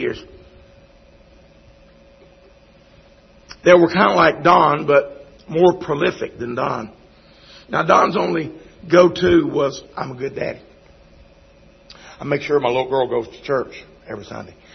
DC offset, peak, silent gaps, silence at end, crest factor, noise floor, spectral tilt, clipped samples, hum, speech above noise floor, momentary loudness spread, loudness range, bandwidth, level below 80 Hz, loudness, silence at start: under 0.1%; 0 dBFS; none; 0.3 s; 20 dB; -49 dBFS; -6 dB/octave; under 0.1%; none; 32 dB; 20 LU; 8 LU; 6.4 kHz; -50 dBFS; -17 LUFS; 0 s